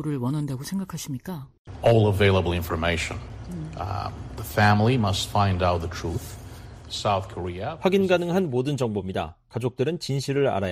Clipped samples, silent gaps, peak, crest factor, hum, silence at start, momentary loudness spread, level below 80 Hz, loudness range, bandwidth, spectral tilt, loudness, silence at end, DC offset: under 0.1%; 1.58-1.65 s; -6 dBFS; 18 dB; none; 0 s; 16 LU; -44 dBFS; 2 LU; 15.5 kHz; -6 dB/octave; -25 LUFS; 0 s; under 0.1%